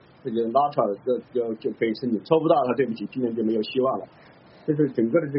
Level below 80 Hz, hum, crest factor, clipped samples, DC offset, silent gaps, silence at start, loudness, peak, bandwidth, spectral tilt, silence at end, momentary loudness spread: -68 dBFS; none; 18 dB; under 0.1%; under 0.1%; none; 0.25 s; -24 LUFS; -6 dBFS; 5.8 kHz; -6 dB/octave; 0 s; 8 LU